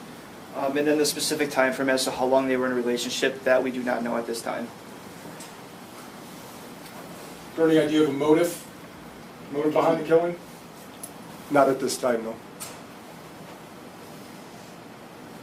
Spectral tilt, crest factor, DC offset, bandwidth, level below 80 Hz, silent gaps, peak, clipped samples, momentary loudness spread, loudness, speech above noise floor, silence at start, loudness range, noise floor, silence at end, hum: -4 dB/octave; 22 dB; under 0.1%; 16 kHz; -66 dBFS; none; -6 dBFS; under 0.1%; 21 LU; -24 LUFS; 20 dB; 0 s; 10 LU; -43 dBFS; 0 s; none